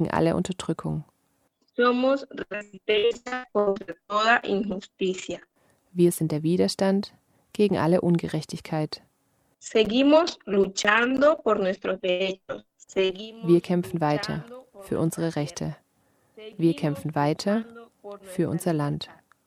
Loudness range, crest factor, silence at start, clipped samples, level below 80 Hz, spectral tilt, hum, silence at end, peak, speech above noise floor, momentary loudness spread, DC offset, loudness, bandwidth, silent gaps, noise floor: 5 LU; 22 dB; 0 s; under 0.1%; -60 dBFS; -5.5 dB/octave; none; 0.35 s; -4 dBFS; 46 dB; 15 LU; under 0.1%; -25 LUFS; 15 kHz; none; -70 dBFS